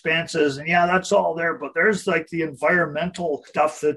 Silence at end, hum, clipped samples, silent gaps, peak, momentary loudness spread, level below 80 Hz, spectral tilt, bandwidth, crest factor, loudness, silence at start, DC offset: 0 s; none; under 0.1%; none; -6 dBFS; 7 LU; -58 dBFS; -4.5 dB/octave; 12 kHz; 16 dB; -21 LUFS; 0.05 s; under 0.1%